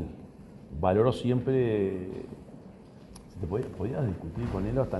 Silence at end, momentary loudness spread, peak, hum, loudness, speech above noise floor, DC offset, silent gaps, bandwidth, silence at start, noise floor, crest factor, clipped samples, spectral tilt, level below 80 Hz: 0 s; 24 LU; -10 dBFS; none; -29 LUFS; 21 dB; under 0.1%; none; 11.5 kHz; 0 s; -49 dBFS; 20 dB; under 0.1%; -8.5 dB/octave; -48 dBFS